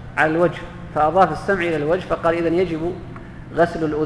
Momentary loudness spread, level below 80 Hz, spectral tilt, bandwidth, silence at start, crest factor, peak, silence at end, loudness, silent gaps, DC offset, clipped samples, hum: 13 LU; -42 dBFS; -7 dB/octave; 11 kHz; 0 s; 18 dB; -2 dBFS; 0 s; -20 LUFS; none; under 0.1%; under 0.1%; none